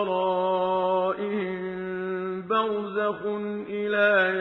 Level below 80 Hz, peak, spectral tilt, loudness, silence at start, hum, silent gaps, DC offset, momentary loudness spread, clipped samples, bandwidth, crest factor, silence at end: -68 dBFS; -10 dBFS; -8 dB/octave; -26 LUFS; 0 s; none; none; under 0.1%; 10 LU; under 0.1%; 5.6 kHz; 16 dB; 0 s